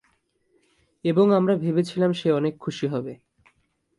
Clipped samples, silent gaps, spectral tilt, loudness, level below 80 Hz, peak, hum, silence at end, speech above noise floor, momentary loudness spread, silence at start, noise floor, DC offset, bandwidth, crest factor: under 0.1%; none; -7.5 dB/octave; -23 LUFS; -68 dBFS; -8 dBFS; none; 0.85 s; 46 dB; 11 LU; 1.05 s; -68 dBFS; under 0.1%; 11.5 kHz; 16 dB